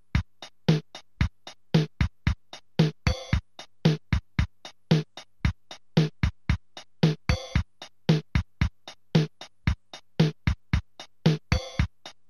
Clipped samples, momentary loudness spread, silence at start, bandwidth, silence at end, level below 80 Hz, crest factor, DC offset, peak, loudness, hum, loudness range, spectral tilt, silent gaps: under 0.1%; 12 LU; 0.15 s; 10.5 kHz; 0.2 s; -36 dBFS; 20 dB; 0.2%; -8 dBFS; -28 LUFS; none; 1 LU; -6.5 dB/octave; none